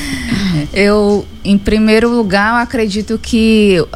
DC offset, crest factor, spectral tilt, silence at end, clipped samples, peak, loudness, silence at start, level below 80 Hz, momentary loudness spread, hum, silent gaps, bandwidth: under 0.1%; 12 dB; -5.5 dB/octave; 0 s; under 0.1%; 0 dBFS; -12 LUFS; 0 s; -30 dBFS; 6 LU; none; none; 13.5 kHz